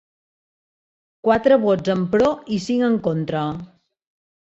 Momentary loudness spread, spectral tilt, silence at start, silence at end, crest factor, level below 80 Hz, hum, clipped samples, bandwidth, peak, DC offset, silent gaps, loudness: 9 LU; -7 dB/octave; 1.25 s; 0.85 s; 18 dB; -54 dBFS; none; under 0.1%; 8 kHz; -4 dBFS; under 0.1%; none; -20 LUFS